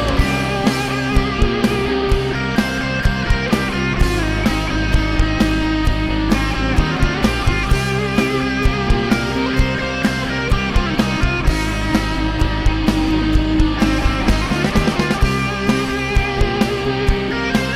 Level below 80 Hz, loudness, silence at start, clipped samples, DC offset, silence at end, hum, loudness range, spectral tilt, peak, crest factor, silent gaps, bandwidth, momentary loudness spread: -22 dBFS; -18 LUFS; 0 s; under 0.1%; under 0.1%; 0 s; none; 1 LU; -5.5 dB/octave; -4 dBFS; 12 dB; none; 15 kHz; 2 LU